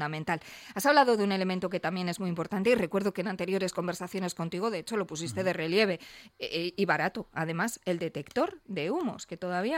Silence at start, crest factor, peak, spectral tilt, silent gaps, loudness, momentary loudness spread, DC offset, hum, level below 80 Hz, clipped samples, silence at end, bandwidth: 0 s; 20 dB; -12 dBFS; -5 dB/octave; none; -30 LUFS; 9 LU; under 0.1%; none; -66 dBFS; under 0.1%; 0 s; 16.5 kHz